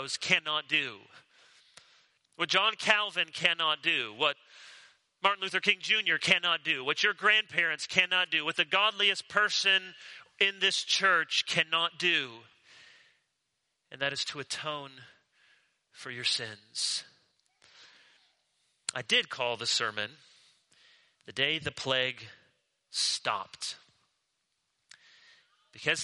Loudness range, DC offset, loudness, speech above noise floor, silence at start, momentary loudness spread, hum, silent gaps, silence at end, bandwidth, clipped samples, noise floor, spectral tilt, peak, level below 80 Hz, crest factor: 10 LU; under 0.1%; -28 LUFS; 51 dB; 0 s; 14 LU; none; none; 0 s; 11.5 kHz; under 0.1%; -81 dBFS; -1 dB/octave; -6 dBFS; -76 dBFS; 26 dB